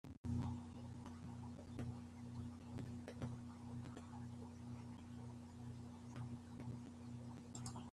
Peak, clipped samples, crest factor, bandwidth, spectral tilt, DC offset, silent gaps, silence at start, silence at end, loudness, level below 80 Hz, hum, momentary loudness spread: -32 dBFS; under 0.1%; 18 dB; 12.5 kHz; -6.5 dB/octave; under 0.1%; 0.17-0.24 s; 0.05 s; 0 s; -52 LUFS; -70 dBFS; none; 6 LU